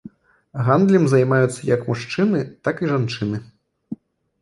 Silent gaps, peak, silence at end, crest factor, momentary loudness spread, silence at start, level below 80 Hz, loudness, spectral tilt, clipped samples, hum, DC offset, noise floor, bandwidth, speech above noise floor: none; -2 dBFS; 0.5 s; 18 dB; 21 LU; 0.05 s; -56 dBFS; -19 LUFS; -7 dB/octave; under 0.1%; none; under 0.1%; -44 dBFS; 11.5 kHz; 25 dB